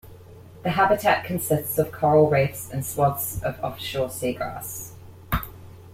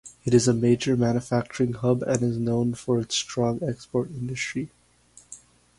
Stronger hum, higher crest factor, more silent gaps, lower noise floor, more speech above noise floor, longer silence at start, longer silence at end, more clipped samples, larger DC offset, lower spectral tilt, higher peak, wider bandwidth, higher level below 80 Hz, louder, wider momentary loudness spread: second, none vs 60 Hz at -40 dBFS; about the same, 18 dB vs 20 dB; neither; second, -45 dBFS vs -56 dBFS; second, 22 dB vs 32 dB; about the same, 0.05 s vs 0.05 s; second, 0 s vs 0.45 s; neither; neither; about the same, -5 dB/octave vs -5.5 dB/octave; about the same, -6 dBFS vs -6 dBFS; first, 16.5 kHz vs 11.5 kHz; first, -44 dBFS vs -56 dBFS; about the same, -24 LUFS vs -25 LUFS; about the same, 13 LU vs 13 LU